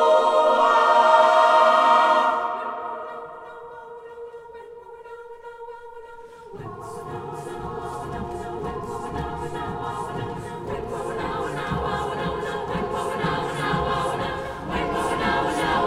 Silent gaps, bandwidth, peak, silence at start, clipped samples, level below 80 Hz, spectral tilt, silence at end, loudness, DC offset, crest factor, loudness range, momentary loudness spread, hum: none; 15.5 kHz; -4 dBFS; 0 s; under 0.1%; -46 dBFS; -5 dB/octave; 0 s; -22 LUFS; under 0.1%; 20 dB; 20 LU; 24 LU; none